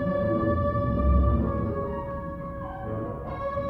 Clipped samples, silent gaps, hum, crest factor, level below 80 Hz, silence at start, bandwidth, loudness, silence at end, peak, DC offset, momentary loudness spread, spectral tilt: under 0.1%; none; none; 16 dB; -30 dBFS; 0 s; 4.2 kHz; -28 LUFS; 0 s; -10 dBFS; under 0.1%; 12 LU; -11 dB/octave